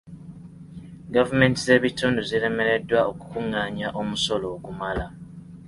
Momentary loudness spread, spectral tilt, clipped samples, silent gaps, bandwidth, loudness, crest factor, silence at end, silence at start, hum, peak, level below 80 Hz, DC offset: 23 LU; -5 dB/octave; under 0.1%; none; 11.5 kHz; -23 LUFS; 20 dB; 0 s; 0.05 s; 50 Hz at -50 dBFS; -4 dBFS; -48 dBFS; under 0.1%